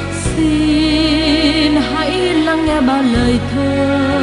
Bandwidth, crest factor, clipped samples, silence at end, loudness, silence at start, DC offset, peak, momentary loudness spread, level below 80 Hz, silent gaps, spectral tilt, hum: 11.5 kHz; 12 dB; under 0.1%; 0 s; -14 LUFS; 0 s; under 0.1%; -2 dBFS; 4 LU; -28 dBFS; none; -5.5 dB/octave; none